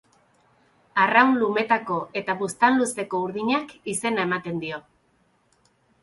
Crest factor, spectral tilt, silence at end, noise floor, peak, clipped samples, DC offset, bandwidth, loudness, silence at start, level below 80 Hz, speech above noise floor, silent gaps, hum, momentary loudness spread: 20 dB; -4 dB/octave; 1.2 s; -65 dBFS; -4 dBFS; under 0.1%; under 0.1%; 12 kHz; -23 LUFS; 0.95 s; -68 dBFS; 42 dB; none; none; 12 LU